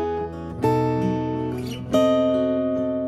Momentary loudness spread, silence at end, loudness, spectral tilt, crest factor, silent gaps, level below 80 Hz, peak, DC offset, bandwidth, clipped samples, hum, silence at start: 9 LU; 0 s; -23 LUFS; -7.5 dB/octave; 16 dB; none; -46 dBFS; -6 dBFS; under 0.1%; 15 kHz; under 0.1%; none; 0 s